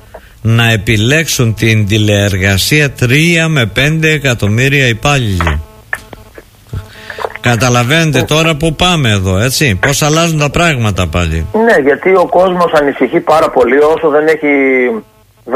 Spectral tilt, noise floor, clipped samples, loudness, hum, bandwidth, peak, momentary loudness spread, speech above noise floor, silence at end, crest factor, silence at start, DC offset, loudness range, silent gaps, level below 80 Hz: -5 dB/octave; -36 dBFS; under 0.1%; -10 LUFS; none; 16 kHz; 0 dBFS; 7 LU; 27 dB; 0 s; 10 dB; 0.15 s; under 0.1%; 4 LU; none; -30 dBFS